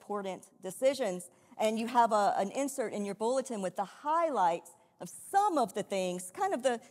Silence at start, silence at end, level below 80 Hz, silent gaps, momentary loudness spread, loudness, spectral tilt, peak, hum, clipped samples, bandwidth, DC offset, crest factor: 0.1 s; 0.05 s; -88 dBFS; none; 14 LU; -32 LUFS; -4 dB/octave; -14 dBFS; none; under 0.1%; 16 kHz; under 0.1%; 18 dB